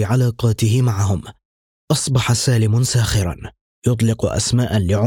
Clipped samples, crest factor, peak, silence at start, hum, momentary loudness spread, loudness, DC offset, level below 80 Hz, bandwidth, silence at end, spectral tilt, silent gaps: under 0.1%; 12 dB; -4 dBFS; 0 s; none; 7 LU; -18 LUFS; under 0.1%; -38 dBFS; 17 kHz; 0 s; -5.5 dB/octave; 1.45-1.88 s, 3.61-3.82 s